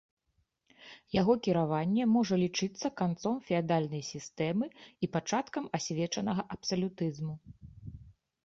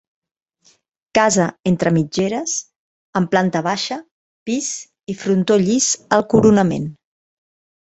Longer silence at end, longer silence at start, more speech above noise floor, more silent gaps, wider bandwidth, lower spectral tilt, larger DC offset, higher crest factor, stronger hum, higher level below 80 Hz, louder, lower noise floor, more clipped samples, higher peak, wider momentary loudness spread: second, 0.35 s vs 1 s; second, 0.8 s vs 1.15 s; first, 46 dB vs 42 dB; second, none vs 2.76-3.13 s, 4.11-4.46 s; about the same, 7.8 kHz vs 8.2 kHz; about the same, -5.5 dB/octave vs -4.5 dB/octave; neither; about the same, 18 dB vs 18 dB; neither; second, -64 dBFS vs -52 dBFS; second, -32 LUFS vs -18 LUFS; first, -77 dBFS vs -59 dBFS; neither; second, -14 dBFS vs 0 dBFS; about the same, 14 LU vs 12 LU